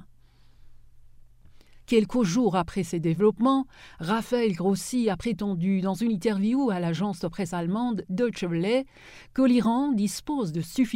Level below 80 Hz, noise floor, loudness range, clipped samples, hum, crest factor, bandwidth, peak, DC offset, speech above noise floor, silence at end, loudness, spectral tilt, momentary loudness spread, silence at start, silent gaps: -54 dBFS; -54 dBFS; 2 LU; under 0.1%; none; 18 dB; 16 kHz; -8 dBFS; under 0.1%; 29 dB; 0 s; -26 LUFS; -6.5 dB/octave; 7 LU; 0 s; none